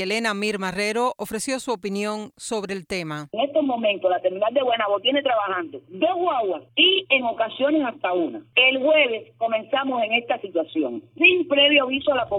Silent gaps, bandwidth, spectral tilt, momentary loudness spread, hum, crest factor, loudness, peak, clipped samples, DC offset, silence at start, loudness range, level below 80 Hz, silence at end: none; 17 kHz; -3.5 dB/octave; 12 LU; none; 20 dB; -21 LUFS; -2 dBFS; under 0.1%; under 0.1%; 0 s; 6 LU; -64 dBFS; 0 s